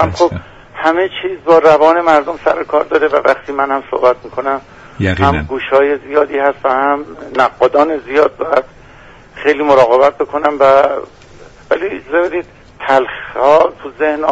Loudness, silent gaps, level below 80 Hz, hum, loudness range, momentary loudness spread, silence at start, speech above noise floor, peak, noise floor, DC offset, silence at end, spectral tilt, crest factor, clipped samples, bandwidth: -13 LUFS; none; -40 dBFS; none; 3 LU; 10 LU; 0 s; 26 dB; 0 dBFS; -39 dBFS; under 0.1%; 0 s; -6.5 dB/octave; 12 dB; under 0.1%; 8 kHz